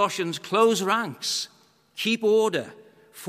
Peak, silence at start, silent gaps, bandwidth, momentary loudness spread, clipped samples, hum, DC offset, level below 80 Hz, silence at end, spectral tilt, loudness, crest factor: -6 dBFS; 0 s; none; 15.5 kHz; 13 LU; under 0.1%; none; under 0.1%; -80 dBFS; 0 s; -3.5 dB/octave; -24 LUFS; 18 dB